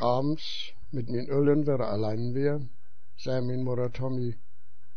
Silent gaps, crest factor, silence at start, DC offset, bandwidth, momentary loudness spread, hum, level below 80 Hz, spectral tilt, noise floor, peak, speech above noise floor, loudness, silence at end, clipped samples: none; 16 dB; 0 s; 3%; 6.6 kHz; 13 LU; none; -58 dBFS; -8 dB/octave; -63 dBFS; -12 dBFS; 35 dB; -30 LUFS; 0.6 s; under 0.1%